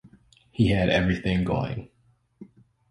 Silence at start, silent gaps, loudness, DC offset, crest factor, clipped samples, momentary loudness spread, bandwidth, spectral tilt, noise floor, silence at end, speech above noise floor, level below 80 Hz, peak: 0.05 s; none; -24 LUFS; under 0.1%; 18 dB; under 0.1%; 14 LU; 11 kHz; -7.5 dB/octave; -56 dBFS; 0.45 s; 33 dB; -42 dBFS; -10 dBFS